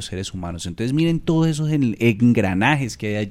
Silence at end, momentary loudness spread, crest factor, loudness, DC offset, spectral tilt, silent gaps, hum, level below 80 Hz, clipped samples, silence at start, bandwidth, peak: 0 s; 11 LU; 16 dB; -20 LUFS; under 0.1%; -6.5 dB/octave; none; none; -44 dBFS; under 0.1%; 0 s; 13.5 kHz; -4 dBFS